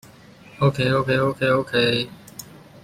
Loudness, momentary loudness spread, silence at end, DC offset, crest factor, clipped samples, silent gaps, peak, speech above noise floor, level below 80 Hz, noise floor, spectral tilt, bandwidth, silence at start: -21 LUFS; 20 LU; 0.05 s; under 0.1%; 16 dB; under 0.1%; none; -6 dBFS; 26 dB; -54 dBFS; -47 dBFS; -6 dB/octave; 16 kHz; 0.6 s